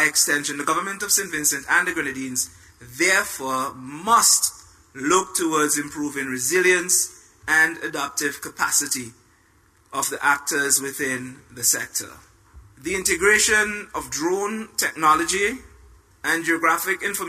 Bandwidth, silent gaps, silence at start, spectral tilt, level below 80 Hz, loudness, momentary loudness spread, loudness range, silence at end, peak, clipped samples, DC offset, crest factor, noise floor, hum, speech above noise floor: 15.5 kHz; none; 0 s; -1 dB/octave; -54 dBFS; -21 LUFS; 12 LU; 3 LU; 0 s; -4 dBFS; under 0.1%; under 0.1%; 18 dB; -58 dBFS; none; 36 dB